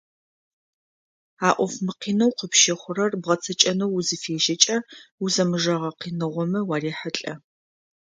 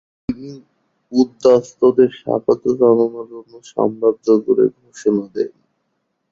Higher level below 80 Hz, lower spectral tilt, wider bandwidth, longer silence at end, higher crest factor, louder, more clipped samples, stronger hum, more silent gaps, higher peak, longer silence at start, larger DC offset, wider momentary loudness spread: second, -70 dBFS vs -56 dBFS; second, -3 dB/octave vs -7 dB/octave; first, 10.5 kHz vs 7.6 kHz; second, 0.65 s vs 0.85 s; first, 24 dB vs 16 dB; second, -22 LUFS vs -17 LUFS; neither; neither; first, 5.11-5.18 s vs none; about the same, 0 dBFS vs -2 dBFS; first, 1.4 s vs 0.3 s; neither; second, 11 LU vs 15 LU